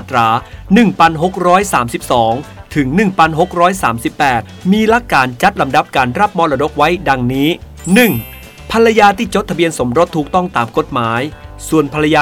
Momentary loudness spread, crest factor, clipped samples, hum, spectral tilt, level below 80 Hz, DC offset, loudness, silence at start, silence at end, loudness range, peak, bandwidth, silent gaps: 7 LU; 12 dB; 0.3%; none; -5.5 dB/octave; -36 dBFS; under 0.1%; -13 LUFS; 0 s; 0 s; 1 LU; 0 dBFS; 19 kHz; none